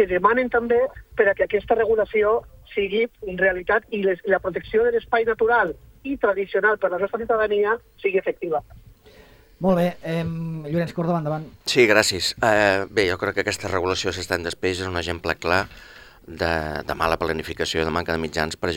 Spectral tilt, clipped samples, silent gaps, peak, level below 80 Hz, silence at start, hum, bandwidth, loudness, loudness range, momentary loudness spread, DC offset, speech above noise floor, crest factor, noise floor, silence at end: -4.5 dB/octave; under 0.1%; none; 0 dBFS; -48 dBFS; 0 s; none; 16.5 kHz; -22 LUFS; 5 LU; 8 LU; under 0.1%; 28 dB; 22 dB; -50 dBFS; 0 s